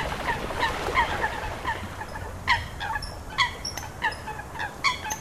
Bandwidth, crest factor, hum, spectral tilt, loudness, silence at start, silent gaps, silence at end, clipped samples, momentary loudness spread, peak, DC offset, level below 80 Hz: 16 kHz; 20 dB; none; -3 dB/octave; -28 LUFS; 0 s; none; 0 s; under 0.1%; 10 LU; -8 dBFS; 0.2%; -42 dBFS